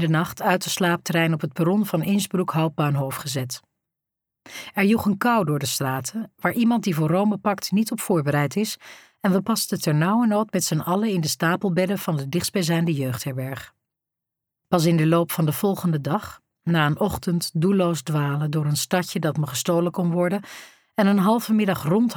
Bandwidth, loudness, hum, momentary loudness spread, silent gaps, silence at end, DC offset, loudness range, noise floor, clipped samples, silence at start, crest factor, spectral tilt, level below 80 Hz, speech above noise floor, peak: over 20 kHz; -23 LUFS; none; 8 LU; none; 0 s; under 0.1%; 2 LU; -85 dBFS; under 0.1%; 0 s; 16 dB; -5.5 dB/octave; -58 dBFS; 64 dB; -6 dBFS